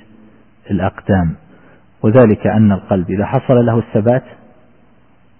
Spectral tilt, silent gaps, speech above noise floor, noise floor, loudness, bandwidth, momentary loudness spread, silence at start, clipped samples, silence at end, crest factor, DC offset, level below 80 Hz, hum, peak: -14 dB/octave; none; 39 dB; -51 dBFS; -14 LUFS; 3.3 kHz; 9 LU; 0.7 s; under 0.1%; 1.2 s; 14 dB; 0.3%; -42 dBFS; none; 0 dBFS